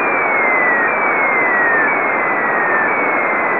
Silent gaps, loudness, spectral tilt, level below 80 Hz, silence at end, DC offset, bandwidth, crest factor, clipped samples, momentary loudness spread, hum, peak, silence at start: none; -13 LUFS; -8 dB/octave; -62 dBFS; 0 s; 0.4%; 4 kHz; 12 dB; under 0.1%; 3 LU; none; -2 dBFS; 0 s